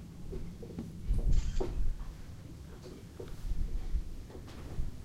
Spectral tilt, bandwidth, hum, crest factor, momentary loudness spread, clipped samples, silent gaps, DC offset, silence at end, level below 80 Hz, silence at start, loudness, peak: -7 dB/octave; 9 kHz; none; 18 dB; 14 LU; under 0.1%; none; under 0.1%; 0 s; -36 dBFS; 0 s; -41 LUFS; -16 dBFS